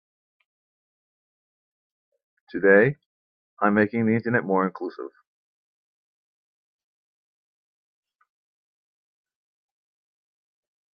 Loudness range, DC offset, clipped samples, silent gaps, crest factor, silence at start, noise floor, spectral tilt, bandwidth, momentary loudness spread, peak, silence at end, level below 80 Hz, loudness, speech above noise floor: 8 LU; under 0.1%; under 0.1%; 3.06-3.57 s; 24 dB; 2.55 s; under -90 dBFS; -11 dB/octave; 5.4 kHz; 20 LU; -4 dBFS; 5.85 s; -72 dBFS; -22 LUFS; over 69 dB